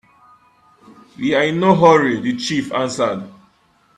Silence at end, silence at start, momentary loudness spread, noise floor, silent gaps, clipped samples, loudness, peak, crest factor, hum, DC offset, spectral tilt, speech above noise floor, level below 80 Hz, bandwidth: 0.65 s; 1.2 s; 12 LU; -57 dBFS; none; under 0.1%; -16 LUFS; 0 dBFS; 18 dB; none; under 0.1%; -5.5 dB/octave; 41 dB; -58 dBFS; 11 kHz